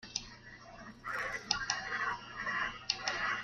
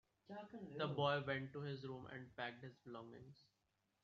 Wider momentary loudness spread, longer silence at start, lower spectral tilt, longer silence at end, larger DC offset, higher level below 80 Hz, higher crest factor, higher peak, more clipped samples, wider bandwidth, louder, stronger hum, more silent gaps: about the same, 17 LU vs 18 LU; second, 0 s vs 0.3 s; second, -0.5 dB/octave vs -4 dB/octave; second, 0 s vs 0.6 s; neither; first, -62 dBFS vs -80 dBFS; first, 28 dB vs 22 dB; first, -10 dBFS vs -26 dBFS; neither; first, 13.5 kHz vs 7 kHz; first, -36 LUFS vs -46 LUFS; neither; neither